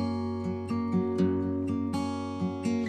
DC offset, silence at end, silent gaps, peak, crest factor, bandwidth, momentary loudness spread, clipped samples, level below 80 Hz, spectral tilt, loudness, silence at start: under 0.1%; 0 s; none; -14 dBFS; 14 dB; 10 kHz; 5 LU; under 0.1%; -60 dBFS; -7.5 dB/octave; -30 LUFS; 0 s